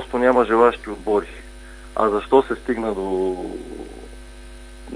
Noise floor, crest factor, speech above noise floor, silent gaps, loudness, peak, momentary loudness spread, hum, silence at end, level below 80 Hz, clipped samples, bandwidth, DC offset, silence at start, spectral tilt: -39 dBFS; 20 dB; 19 dB; none; -20 LUFS; -2 dBFS; 25 LU; none; 0 s; -40 dBFS; under 0.1%; 10.5 kHz; under 0.1%; 0 s; -6 dB/octave